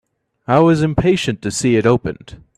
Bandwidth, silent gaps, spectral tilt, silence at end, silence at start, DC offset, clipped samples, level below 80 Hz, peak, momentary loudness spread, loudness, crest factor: 13.5 kHz; none; -6 dB/octave; 0.25 s; 0.5 s; under 0.1%; under 0.1%; -40 dBFS; 0 dBFS; 15 LU; -15 LUFS; 16 dB